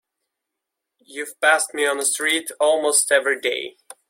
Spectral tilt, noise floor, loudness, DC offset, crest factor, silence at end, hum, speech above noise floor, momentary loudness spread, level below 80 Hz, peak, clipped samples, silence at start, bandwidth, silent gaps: 1 dB/octave; -83 dBFS; -19 LUFS; under 0.1%; 20 dB; 0.4 s; none; 62 dB; 16 LU; -74 dBFS; -2 dBFS; under 0.1%; 1.1 s; 16.5 kHz; none